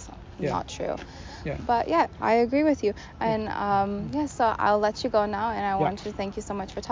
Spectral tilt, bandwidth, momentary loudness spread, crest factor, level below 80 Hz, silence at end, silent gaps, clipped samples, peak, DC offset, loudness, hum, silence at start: -6 dB/octave; 7.6 kHz; 10 LU; 16 dB; -46 dBFS; 0 s; none; under 0.1%; -10 dBFS; under 0.1%; -26 LUFS; none; 0 s